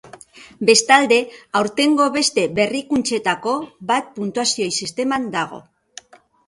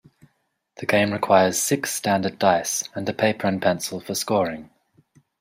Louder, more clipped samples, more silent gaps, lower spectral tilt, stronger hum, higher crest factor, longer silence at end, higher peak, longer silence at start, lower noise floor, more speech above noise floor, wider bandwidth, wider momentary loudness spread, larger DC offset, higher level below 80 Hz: first, -18 LUFS vs -22 LUFS; neither; neither; about the same, -2.5 dB/octave vs -3.5 dB/octave; neither; about the same, 20 dB vs 20 dB; about the same, 0.85 s vs 0.75 s; about the same, 0 dBFS vs -2 dBFS; second, 0.15 s vs 0.8 s; second, -44 dBFS vs -72 dBFS; second, 25 dB vs 50 dB; second, 11.5 kHz vs 16 kHz; about the same, 11 LU vs 10 LU; neither; about the same, -60 dBFS vs -64 dBFS